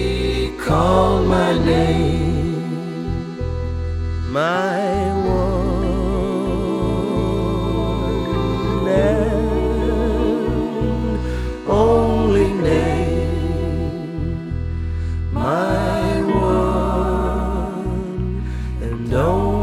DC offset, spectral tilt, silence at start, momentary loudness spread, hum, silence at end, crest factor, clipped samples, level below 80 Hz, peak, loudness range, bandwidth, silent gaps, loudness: under 0.1%; -7.5 dB/octave; 0 s; 9 LU; none; 0 s; 16 dB; under 0.1%; -26 dBFS; -2 dBFS; 3 LU; 13.5 kHz; none; -20 LUFS